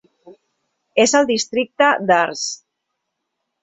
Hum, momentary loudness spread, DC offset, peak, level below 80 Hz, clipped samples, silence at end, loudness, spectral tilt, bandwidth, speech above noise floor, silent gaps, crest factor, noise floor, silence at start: none; 11 LU; under 0.1%; -2 dBFS; -64 dBFS; under 0.1%; 1.1 s; -17 LUFS; -2.5 dB/octave; 8.4 kHz; 60 dB; none; 18 dB; -77 dBFS; 0.25 s